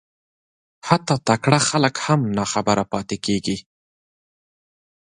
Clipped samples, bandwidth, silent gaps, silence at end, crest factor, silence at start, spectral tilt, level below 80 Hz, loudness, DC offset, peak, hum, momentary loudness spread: under 0.1%; 11.5 kHz; none; 1.45 s; 22 dB; 0.85 s; -4.5 dB/octave; -54 dBFS; -20 LUFS; under 0.1%; 0 dBFS; none; 9 LU